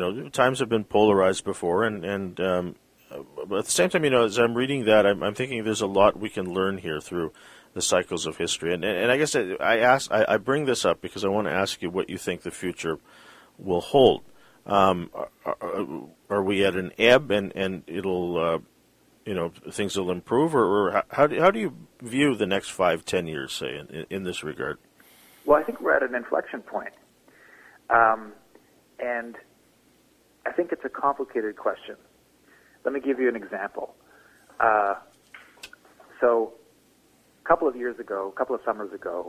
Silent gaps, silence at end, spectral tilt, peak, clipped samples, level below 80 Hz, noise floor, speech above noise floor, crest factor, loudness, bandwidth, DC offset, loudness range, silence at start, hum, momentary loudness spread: none; 0 s; -4 dB/octave; -2 dBFS; under 0.1%; -58 dBFS; -61 dBFS; 37 dB; 22 dB; -25 LUFS; 15.5 kHz; under 0.1%; 6 LU; 0 s; none; 14 LU